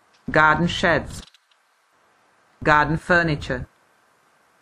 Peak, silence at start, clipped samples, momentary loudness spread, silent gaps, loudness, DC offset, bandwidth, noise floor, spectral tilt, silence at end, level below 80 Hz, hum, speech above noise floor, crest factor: -2 dBFS; 0.3 s; under 0.1%; 17 LU; none; -20 LUFS; under 0.1%; 12.5 kHz; -63 dBFS; -5.5 dB/octave; 0.95 s; -42 dBFS; none; 43 dB; 22 dB